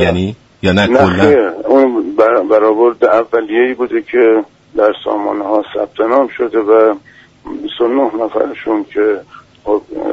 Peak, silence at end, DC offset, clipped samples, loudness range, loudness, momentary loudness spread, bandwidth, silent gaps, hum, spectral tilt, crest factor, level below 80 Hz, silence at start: 0 dBFS; 0 s; under 0.1%; under 0.1%; 4 LU; -13 LUFS; 9 LU; 8 kHz; none; none; -7 dB/octave; 12 dB; -46 dBFS; 0 s